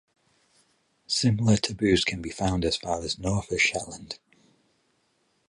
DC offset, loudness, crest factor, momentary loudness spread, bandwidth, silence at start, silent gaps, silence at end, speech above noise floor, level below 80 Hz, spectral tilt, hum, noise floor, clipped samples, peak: under 0.1%; -26 LUFS; 20 dB; 13 LU; 11.5 kHz; 1.1 s; none; 1.35 s; 45 dB; -46 dBFS; -4.5 dB/octave; none; -70 dBFS; under 0.1%; -8 dBFS